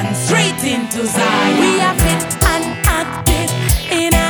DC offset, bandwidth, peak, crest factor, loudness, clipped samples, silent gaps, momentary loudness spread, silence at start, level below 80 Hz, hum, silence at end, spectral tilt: under 0.1%; over 20 kHz; 0 dBFS; 14 dB; -15 LUFS; under 0.1%; none; 4 LU; 0 s; -24 dBFS; none; 0 s; -4 dB/octave